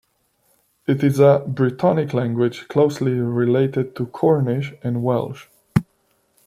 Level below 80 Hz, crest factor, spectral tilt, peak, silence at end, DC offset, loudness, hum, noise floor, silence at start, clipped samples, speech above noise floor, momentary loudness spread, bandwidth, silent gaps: -54 dBFS; 18 dB; -8.5 dB/octave; -2 dBFS; 0.65 s; under 0.1%; -20 LUFS; none; -64 dBFS; 0.9 s; under 0.1%; 46 dB; 9 LU; 15 kHz; none